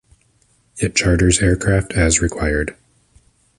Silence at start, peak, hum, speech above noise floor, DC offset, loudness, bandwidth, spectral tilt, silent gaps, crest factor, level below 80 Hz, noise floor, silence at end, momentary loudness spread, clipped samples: 0.75 s; 0 dBFS; none; 43 dB; under 0.1%; -17 LUFS; 11.5 kHz; -4.5 dB/octave; none; 18 dB; -28 dBFS; -59 dBFS; 0.85 s; 8 LU; under 0.1%